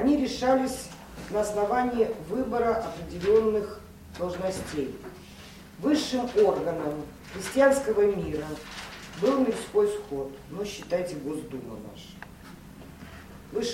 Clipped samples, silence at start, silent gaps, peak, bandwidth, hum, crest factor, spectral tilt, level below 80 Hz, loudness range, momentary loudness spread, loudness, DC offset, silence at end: under 0.1%; 0 s; none; -8 dBFS; 16.5 kHz; none; 20 dB; -5 dB/octave; -52 dBFS; 6 LU; 22 LU; -27 LUFS; under 0.1%; 0 s